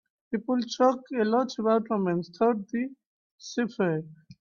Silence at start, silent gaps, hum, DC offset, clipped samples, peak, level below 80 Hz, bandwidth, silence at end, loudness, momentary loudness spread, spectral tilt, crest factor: 0.3 s; 3.06-3.38 s; none; under 0.1%; under 0.1%; -10 dBFS; -72 dBFS; 7.2 kHz; 0.1 s; -28 LUFS; 10 LU; -6 dB/octave; 16 dB